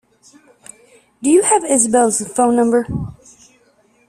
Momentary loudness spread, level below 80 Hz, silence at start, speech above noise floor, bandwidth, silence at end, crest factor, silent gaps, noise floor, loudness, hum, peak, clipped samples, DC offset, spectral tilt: 12 LU; -48 dBFS; 1.2 s; 41 dB; 14 kHz; 0.95 s; 16 dB; none; -56 dBFS; -15 LUFS; none; -2 dBFS; under 0.1%; under 0.1%; -4.5 dB/octave